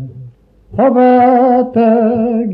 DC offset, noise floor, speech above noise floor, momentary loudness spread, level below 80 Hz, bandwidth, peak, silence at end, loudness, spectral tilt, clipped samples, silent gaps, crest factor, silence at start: under 0.1%; -38 dBFS; 29 dB; 8 LU; -50 dBFS; 4.9 kHz; 0 dBFS; 0 s; -10 LUFS; -10.5 dB/octave; under 0.1%; none; 10 dB; 0 s